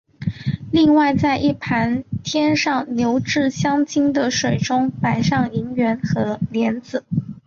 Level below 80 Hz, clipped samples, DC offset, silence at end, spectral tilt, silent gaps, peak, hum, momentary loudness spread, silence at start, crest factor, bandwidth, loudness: -48 dBFS; under 0.1%; under 0.1%; 0.05 s; -5.5 dB/octave; none; -6 dBFS; none; 8 LU; 0.2 s; 14 dB; 7.4 kHz; -19 LUFS